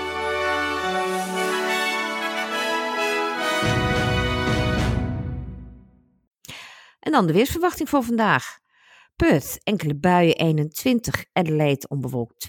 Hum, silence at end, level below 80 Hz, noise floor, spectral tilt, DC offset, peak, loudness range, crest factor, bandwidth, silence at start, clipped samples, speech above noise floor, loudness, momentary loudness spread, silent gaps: none; 0 s; -40 dBFS; -55 dBFS; -5 dB/octave; under 0.1%; -4 dBFS; 4 LU; 20 dB; 18 kHz; 0 s; under 0.1%; 34 dB; -22 LUFS; 11 LU; 6.27-6.31 s